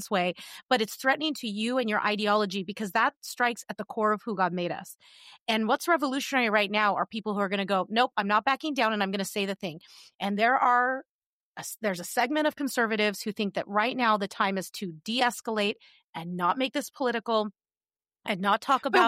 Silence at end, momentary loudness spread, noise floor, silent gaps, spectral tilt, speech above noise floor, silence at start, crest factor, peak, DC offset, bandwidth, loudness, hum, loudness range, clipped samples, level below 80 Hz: 0 s; 12 LU; under -90 dBFS; 0.65-0.69 s, 3.17-3.22 s, 5.40-5.46 s, 10.15-10.19 s, 11.09-11.55 s, 16.04-16.13 s; -4 dB/octave; over 62 dB; 0 s; 18 dB; -10 dBFS; under 0.1%; 16 kHz; -27 LUFS; none; 3 LU; under 0.1%; -80 dBFS